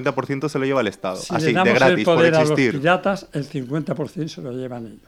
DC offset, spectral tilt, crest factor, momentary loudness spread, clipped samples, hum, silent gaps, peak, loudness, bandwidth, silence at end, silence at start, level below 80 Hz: under 0.1%; -6 dB/octave; 18 dB; 14 LU; under 0.1%; none; none; -2 dBFS; -19 LUFS; 15 kHz; 0.1 s; 0 s; -58 dBFS